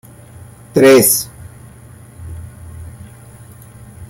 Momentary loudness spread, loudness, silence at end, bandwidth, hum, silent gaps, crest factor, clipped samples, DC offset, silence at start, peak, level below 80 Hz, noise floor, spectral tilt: 27 LU; -10 LUFS; 0.05 s; 16.5 kHz; none; none; 18 dB; under 0.1%; under 0.1%; 0.75 s; 0 dBFS; -46 dBFS; -39 dBFS; -4 dB/octave